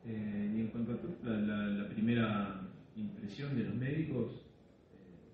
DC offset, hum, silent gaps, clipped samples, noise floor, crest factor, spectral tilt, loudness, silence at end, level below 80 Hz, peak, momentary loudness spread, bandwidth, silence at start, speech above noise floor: under 0.1%; none; none; under 0.1%; -61 dBFS; 16 dB; -9 dB/octave; -38 LUFS; 0 s; -66 dBFS; -22 dBFS; 11 LU; 5.6 kHz; 0 s; 24 dB